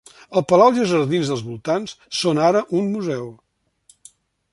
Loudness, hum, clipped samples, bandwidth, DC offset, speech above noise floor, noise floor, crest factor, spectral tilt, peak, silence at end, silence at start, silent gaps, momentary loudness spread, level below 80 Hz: -19 LUFS; none; under 0.1%; 11.5 kHz; under 0.1%; 38 dB; -57 dBFS; 18 dB; -5.5 dB/octave; -2 dBFS; 1.2 s; 0.3 s; none; 12 LU; -62 dBFS